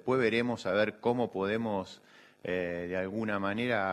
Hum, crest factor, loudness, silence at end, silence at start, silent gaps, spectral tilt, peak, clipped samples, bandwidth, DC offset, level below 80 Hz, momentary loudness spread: none; 18 dB; -32 LUFS; 0 s; 0.05 s; none; -6.5 dB/octave; -14 dBFS; under 0.1%; 12.5 kHz; under 0.1%; -68 dBFS; 7 LU